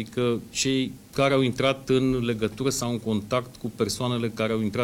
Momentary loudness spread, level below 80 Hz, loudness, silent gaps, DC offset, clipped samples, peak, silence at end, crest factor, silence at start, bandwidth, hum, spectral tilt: 6 LU; -52 dBFS; -25 LUFS; none; under 0.1%; under 0.1%; -8 dBFS; 0 s; 18 dB; 0 s; 17 kHz; none; -5 dB/octave